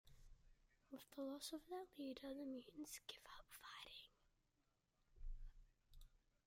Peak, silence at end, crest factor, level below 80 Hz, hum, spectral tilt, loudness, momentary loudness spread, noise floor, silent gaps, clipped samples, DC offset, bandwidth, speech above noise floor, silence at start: -38 dBFS; 0.3 s; 18 dB; -64 dBFS; none; -3 dB/octave; -55 LUFS; 11 LU; -86 dBFS; none; under 0.1%; under 0.1%; 16 kHz; 32 dB; 0.05 s